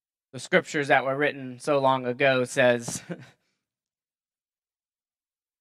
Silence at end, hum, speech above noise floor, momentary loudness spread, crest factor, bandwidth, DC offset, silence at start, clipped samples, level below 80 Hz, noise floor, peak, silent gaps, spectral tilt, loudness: 2.35 s; none; over 65 dB; 18 LU; 22 dB; 14.5 kHz; under 0.1%; 0.35 s; under 0.1%; -72 dBFS; under -90 dBFS; -4 dBFS; none; -4.5 dB/octave; -24 LUFS